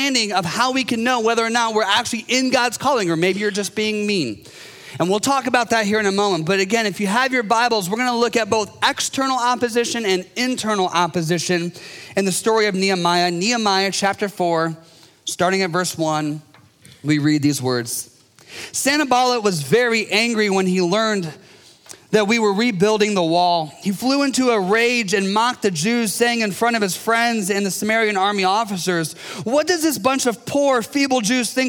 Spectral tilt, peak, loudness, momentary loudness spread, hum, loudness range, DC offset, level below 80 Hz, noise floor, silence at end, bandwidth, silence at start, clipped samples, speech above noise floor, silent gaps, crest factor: -3.5 dB/octave; -2 dBFS; -19 LUFS; 6 LU; none; 2 LU; under 0.1%; -66 dBFS; -48 dBFS; 0 s; 19 kHz; 0 s; under 0.1%; 29 dB; none; 16 dB